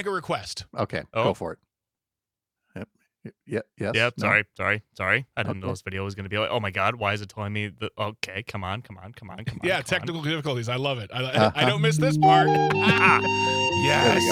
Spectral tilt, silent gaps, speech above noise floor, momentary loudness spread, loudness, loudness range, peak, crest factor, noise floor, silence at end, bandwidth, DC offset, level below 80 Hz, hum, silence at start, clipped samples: -5 dB/octave; none; 65 dB; 15 LU; -24 LUFS; 10 LU; -4 dBFS; 22 dB; -89 dBFS; 0 s; 15.5 kHz; under 0.1%; -60 dBFS; none; 0 s; under 0.1%